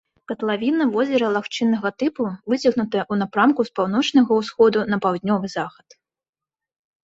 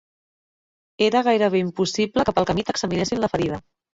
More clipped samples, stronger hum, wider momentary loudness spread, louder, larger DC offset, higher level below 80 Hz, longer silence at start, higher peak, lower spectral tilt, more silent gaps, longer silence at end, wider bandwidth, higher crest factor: neither; neither; about the same, 8 LU vs 6 LU; about the same, -20 LUFS vs -22 LUFS; neither; second, -62 dBFS vs -50 dBFS; second, 0.3 s vs 1 s; about the same, -4 dBFS vs -4 dBFS; about the same, -6 dB/octave vs -5 dB/octave; neither; first, 1.35 s vs 0.4 s; about the same, 8 kHz vs 7.8 kHz; about the same, 16 dB vs 18 dB